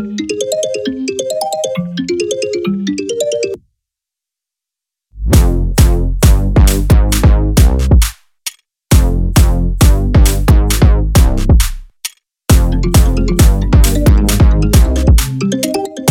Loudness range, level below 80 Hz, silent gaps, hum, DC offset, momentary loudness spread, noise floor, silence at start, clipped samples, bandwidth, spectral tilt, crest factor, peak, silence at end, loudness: 7 LU; -12 dBFS; none; none; under 0.1%; 9 LU; -84 dBFS; 0 s; under 0.1%; 17 kHz; -5.5 dB/octave; 10 dB; 0 dBFS; 0 s; -12 LUFS